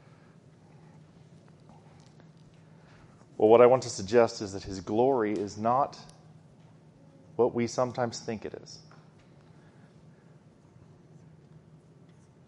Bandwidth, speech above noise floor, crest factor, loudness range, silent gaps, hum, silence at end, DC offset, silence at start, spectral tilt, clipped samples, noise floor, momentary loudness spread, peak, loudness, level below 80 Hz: 9.8 kHz; 30 dB; 26 dB; 11 LU; none; none; 3.7 s; under 0.1%; 3.4 s; -5.5 dB/octave; under 0.1%; -57 dBFS; 23 LU; -6 dBFS; -26 LUFS; -66 dBFS